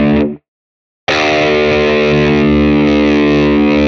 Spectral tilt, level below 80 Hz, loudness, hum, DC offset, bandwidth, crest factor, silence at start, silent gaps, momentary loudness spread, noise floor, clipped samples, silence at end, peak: -6.5 dB/octave; -30 dBFS; -11 LUFS; none; under 0.1%; 7 kHz; 10 dB; 0 s; 0.48-1.07 s; 5 LU; under -90 dBFS; under 0.1%; 0 s; 0 dBFS